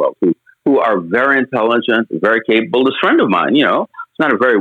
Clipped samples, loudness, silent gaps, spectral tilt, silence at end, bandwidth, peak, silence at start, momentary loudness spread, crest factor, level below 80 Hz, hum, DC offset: under 0.1%; -14 LUFS; none; -7 dB/octave; 0 s; 4.7 kHz; 0 dBFS; 0 s; 6 LU; 14 dB; -64 dBFS; none; under 0.1%